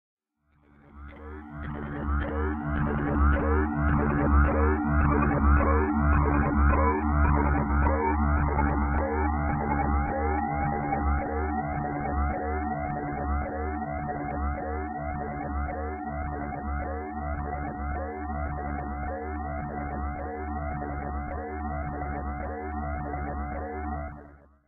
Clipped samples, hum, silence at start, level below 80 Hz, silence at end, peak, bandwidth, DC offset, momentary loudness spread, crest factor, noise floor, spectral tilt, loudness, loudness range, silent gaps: under 0.1%; none; 0.95 s; -30 dBFS; 0.35 s; -10 dBFS; 3.2 kHz; under 0.1%; 10 LU; 16 dB; -67 dBFS; -12 dB/octave; -28 LUFS; 10 LU; none